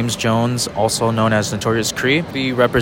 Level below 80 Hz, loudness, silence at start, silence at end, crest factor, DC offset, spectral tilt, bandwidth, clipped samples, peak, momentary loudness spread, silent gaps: -44 dBFS; -17 LUFS; 0 s; 0 s; 16 dB; under 0.1%; -4.5 dB/octave; 17 kHz; under 0.1%; 0 dBFS; 3 LU; none